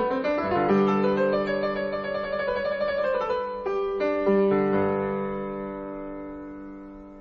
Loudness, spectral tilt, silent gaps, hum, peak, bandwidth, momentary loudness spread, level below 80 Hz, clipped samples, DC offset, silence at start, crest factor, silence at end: -25 LUFS; -8.5 dB/octave; none; none; -10 dBFS; 6.4 kHz; 16 LU; -52 dBFS; under 0.1%; under 0.1%; 0 s; 16 dB; 0 s